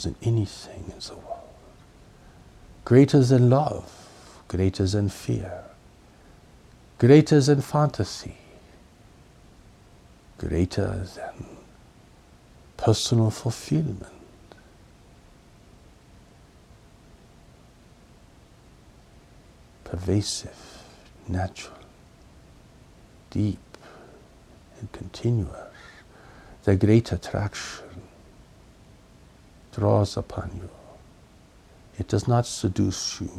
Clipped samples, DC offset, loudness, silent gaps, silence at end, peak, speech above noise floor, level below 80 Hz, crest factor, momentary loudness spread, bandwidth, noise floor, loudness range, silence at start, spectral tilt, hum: under 0.1%; under 0.1%; -24 LUFS; none; 0 s; -2 dBFS; 30 dB; -48 dBFS; 24 dB; 25 LU; 13 kHz; -53 dBFS; 12 LU; 0 s; -6.5 dB/octave; none